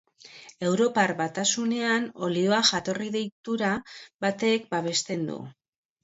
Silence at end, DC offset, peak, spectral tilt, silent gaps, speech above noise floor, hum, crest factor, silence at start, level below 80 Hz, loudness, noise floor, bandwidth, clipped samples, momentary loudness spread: 0.5 s; under 0.1%; -6 dBFS; -3.5 dB/octave; 3.32-3.44 s, 4.14-4.19 s; 23 dB; none; 20 dB; 0.25 s; -68 dBFS; -26 LUFS; -50 dBFS; 8 kHz; under 0.1%; 11 LU